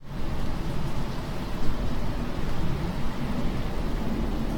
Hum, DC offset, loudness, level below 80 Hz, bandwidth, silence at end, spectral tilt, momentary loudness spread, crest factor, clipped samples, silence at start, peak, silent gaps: none; under 0.1%; -32 LUFS; -30 dBFS; 16.5 kHz; 0 s; -6.5 dB/octave; 3 LU; 14 dB; under 0.1%; 0 s; -10 dBFS; none